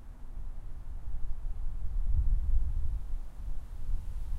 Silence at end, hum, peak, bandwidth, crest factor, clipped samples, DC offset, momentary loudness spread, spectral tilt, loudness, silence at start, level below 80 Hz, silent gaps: 0 s; none; -16 dBFS; 1.8 kHz; 14 dB; under 0.1%; under 0.1%; 14 LU; -8 dB/octave; -39 LUFS; 0 s; -32 dBFS; none